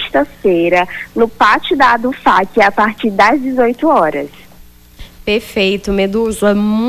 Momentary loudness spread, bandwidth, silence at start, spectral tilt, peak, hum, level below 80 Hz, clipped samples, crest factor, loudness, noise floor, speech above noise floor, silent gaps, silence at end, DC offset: 6 LU; 15.5 kHz; 0 s; -5 dB/octave; 0 dBFS; none; -40 dBFS; under 0.1%; 12 dB; -13 LUFS; -40 dBFS; 28 dB; none; 0 s; under 0.1%